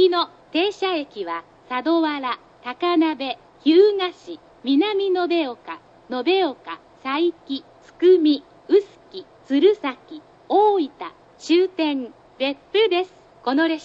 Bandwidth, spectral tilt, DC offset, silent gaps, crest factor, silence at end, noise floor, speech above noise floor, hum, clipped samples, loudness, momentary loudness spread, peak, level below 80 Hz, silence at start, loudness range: 7.8 kHz; -4 dB/octave; under 0.1%; none; 16 dB; 0 s; -40 dBFS; 20 dB; none; under 0.1%; -21 LUFS; 20 LU; -4 dBFS; -68 dBFS; 0 s; 3 LU